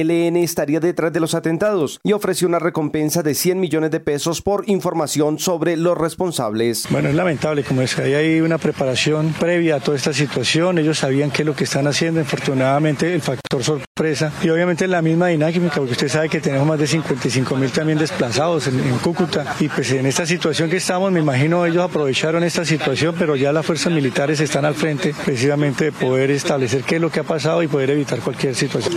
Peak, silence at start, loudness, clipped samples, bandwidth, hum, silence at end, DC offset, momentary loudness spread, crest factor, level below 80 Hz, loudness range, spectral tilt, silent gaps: -6 dBFS; 0 s; -18 LUFS; under 0.1%; 16.5 kHz; none; 0 s; under 0.1%; 3 LU; 12 dB; -54 dBFS; 1 LU; -5 dB/octave; 13.87-13.95 s